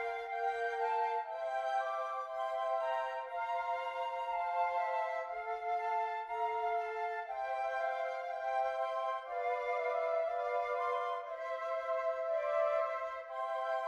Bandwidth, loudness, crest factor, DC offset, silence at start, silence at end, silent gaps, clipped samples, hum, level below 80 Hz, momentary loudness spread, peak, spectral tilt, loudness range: 11 kHz; -37 LUFS; 14 dB; under 0.1%; 0 s; 0 s; none; under 0.1%; none; -76 dBFS; 5 LU; -22 dBFS; -1 dB/octave; 1 LU